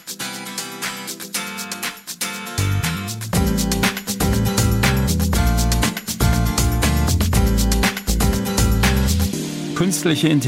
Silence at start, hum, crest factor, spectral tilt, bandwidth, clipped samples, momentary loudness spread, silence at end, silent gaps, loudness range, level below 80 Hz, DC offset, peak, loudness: 0.05 s; none; 14 dB; -4.5 dB/octave; 16 kHz; under 0.1%; 9 LU; 0 s; none; 5 LU; -24 dBFS; under 0.1%; -4 dBFS; -20 LUFS